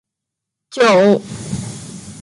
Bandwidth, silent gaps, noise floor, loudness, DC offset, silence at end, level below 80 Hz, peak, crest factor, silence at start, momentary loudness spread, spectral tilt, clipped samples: 11.5 kHz; none; -81 dBFS; -14 LUFS; under 0.1%; 0 s; -50 dBFS; -2 dBFS; 16 dB; 0.75 s; 21 LU; -5 dB/octave; under 0.1%